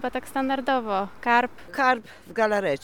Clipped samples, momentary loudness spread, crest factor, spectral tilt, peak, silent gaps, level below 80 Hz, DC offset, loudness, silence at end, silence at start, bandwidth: under 0.1%; 7 LU; 18 dB; -4.5 dB/octave; -6 dBFS; none; -58 dBFS; 0.7%; -25 LUFS; 0.05 s; 0 s; 18.5 kHz